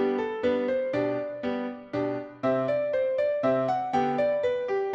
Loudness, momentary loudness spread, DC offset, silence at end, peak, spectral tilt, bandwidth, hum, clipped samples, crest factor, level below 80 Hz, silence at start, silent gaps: -27 LUFS; 6 LU; under 0.1%; 0 s; -12 dBFS; -7.5 dB/octave; 7.6 kHz; none; under 0.1%; 14 dB; -64 dBFS; 0 s; none